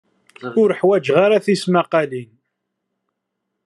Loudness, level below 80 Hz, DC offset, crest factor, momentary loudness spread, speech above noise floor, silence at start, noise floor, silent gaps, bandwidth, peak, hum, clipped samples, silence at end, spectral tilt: -17 LUFS; -72 dBFS; under 0.1%; 18 dB; 12 LU; 61 dB; 0.4 s; -77 dBFS; none; 11.5 kHz; -2 dBFS; none; under 0.1%; 1.4 s; -6 dB/octave